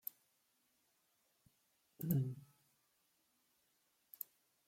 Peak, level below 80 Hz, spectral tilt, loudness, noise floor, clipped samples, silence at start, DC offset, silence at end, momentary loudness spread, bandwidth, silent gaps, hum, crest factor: -22 dBFS; -80 dBFS; -8 dB/octave; -43 LUFS; -80 dBFS; under 0.1%; 2 s; under 0.1%; 2.25 s; 16 LU; 16.5 kHz; none; none; 28 dB